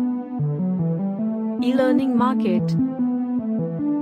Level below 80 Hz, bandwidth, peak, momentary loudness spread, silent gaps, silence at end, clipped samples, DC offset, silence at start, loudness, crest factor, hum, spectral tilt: -62 dBFS; 9.4 kHz; -8 dBFS; 6 LU; none; 0 s; under 0.1%; under 0.1%; 0 s; -22 LUFS; 14 dB; none; -9 dB/octave